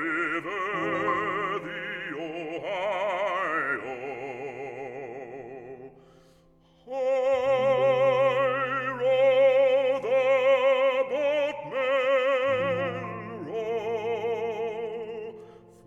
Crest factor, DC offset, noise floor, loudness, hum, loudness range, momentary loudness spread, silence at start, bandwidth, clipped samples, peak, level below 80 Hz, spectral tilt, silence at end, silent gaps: 14 dB; under 0.1%; -59 dBFS; -26 LUFS; none; 10 LU; 16 LU; 0 s; 7.8 kHz; under 0.1%; -12 dBFS; -66 dBFS; -5.5 dB/octave; 0.35 s; none